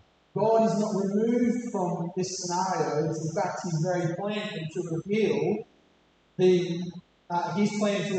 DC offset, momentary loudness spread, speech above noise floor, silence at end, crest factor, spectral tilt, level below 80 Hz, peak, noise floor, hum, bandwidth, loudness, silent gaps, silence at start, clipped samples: under 0.1%; 10 LU; 37 dB; 0 s; 16 dB; -6 dB/octave; -72 dBFS; -12 dBFS; -64 dBFS; none; 9 kHz; -28 LUFS; none; 0.35 s; under 0.1%